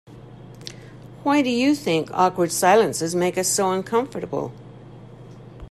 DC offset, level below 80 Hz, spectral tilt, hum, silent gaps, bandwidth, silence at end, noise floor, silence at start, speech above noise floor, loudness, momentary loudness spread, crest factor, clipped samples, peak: under 0.1%; -54 dBFS; -4 dB/octave; 50 Hz at -50 dBFS; none; 14 kHz; 0.05 s; -42 dBFS; 0.1 s; 21 dB; -21 LUFS; 23 LU; 18 dB; under 0.1%; -6 dBFS